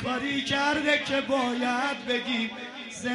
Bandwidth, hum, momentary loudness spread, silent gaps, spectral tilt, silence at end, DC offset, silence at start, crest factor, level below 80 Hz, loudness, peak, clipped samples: 11.5 kHz; none; 9 LU; none; -3.5 dB/octave; 0 s; under 0.1%; 0 s; 18 dB; -62 dBFS; -27 LUFS; -10 dBFS; under 0.1%